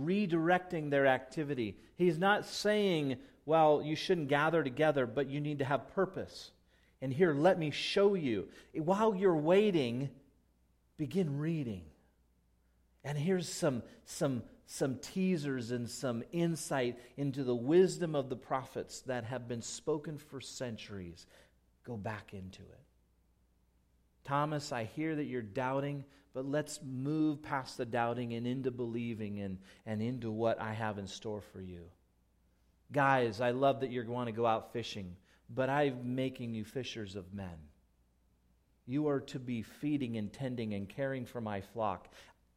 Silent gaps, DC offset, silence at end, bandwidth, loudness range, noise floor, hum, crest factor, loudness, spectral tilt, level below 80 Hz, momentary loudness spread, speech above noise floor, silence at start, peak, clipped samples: none; under 0.1%; 0.35 s; 15.5 kHz; 10 LU; -72 dBFS; none; 20 dB; -35 LUFS; -6 dB/octave; -68 dBFS; 15 LU; 37 dB; 0 s; -14 dBFS; under 0.1%